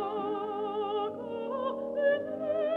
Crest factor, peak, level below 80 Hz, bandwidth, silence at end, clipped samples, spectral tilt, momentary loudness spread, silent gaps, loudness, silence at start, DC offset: 14 dB; -16 dBFS; -74 dBFS; 4.3 kHz; 0 s; under 0.1%; -7 dB/octave; 6 LU; none; -32 LUFS; 0 s; under 0.1%